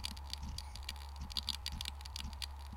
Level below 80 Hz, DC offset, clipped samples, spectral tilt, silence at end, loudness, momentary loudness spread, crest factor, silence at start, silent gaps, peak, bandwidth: -48 dBFS; under 0.1%; under 0.1%; -2.5 dB/octave; 0 s; -43 LUFS; 7 LU; 26 dB; 0 s; none; -18 dBFS; 17 kHz